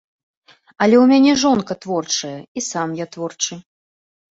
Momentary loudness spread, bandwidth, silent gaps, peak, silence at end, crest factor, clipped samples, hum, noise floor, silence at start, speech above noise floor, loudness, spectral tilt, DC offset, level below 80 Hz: 15 LU; 7.8 kHz; 2.48-2.55 s; -2 dBFS; 0.7 s; 16 dB; under 0.1%; none; under -90 dBFS; 0.8 s; over 73 dB; -17 LUFS; -4 dB/octave; under 0.1%; -60 dBFS